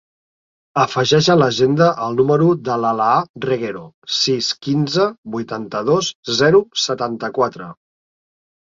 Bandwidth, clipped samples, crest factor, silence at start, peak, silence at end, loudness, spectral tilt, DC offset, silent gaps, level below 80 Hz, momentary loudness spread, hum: 7.6 kHz; under 0.1%; 16 dB; 0.75 s; -2 dBFS; 0.9 s; -17 LUFS; -5 dB/octave; under 0.1%; 3.29-3.34 s, 3.94-4.02 s, 5.18-5.23 s, 6.15-6.23 s; -56 dBFS; 11 LU; none